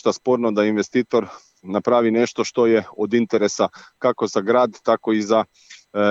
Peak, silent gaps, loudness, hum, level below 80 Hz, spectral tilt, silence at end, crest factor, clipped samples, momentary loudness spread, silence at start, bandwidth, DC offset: -4 dBFS; none; -20 LUFS; none; -70 dBFS; -5 dB/octave; 0 s; 16 dB; under 0.1%; 6 LU; 0.05 s; 8 kHz; under 0.1%